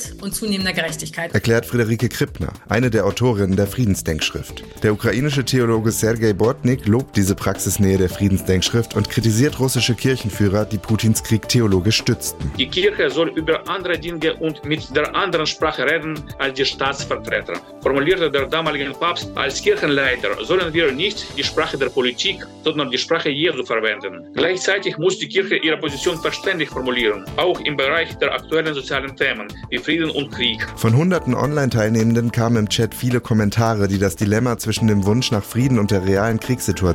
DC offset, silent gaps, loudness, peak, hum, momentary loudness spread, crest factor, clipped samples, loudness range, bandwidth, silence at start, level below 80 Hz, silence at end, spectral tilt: under 0.1%; none; -19 LUFS; -4 dBFS; none; 5 LU; 14 dB; under 0.1%; 2 LU; 17 kHz; 0 s; -42 dBFS; 0 s; -5 dB/octave